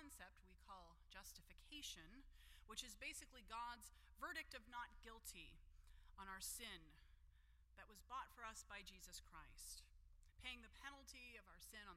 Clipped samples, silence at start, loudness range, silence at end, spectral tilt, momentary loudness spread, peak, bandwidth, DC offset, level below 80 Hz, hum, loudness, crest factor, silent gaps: under 0.1%; 0 s; 4 LU; 0 s; -1 dB/octave; 12 LU; -36 dBFS; 16 kHz; under 0.1%; -68 dBFS; none; -57 LUFS; 22 dB; none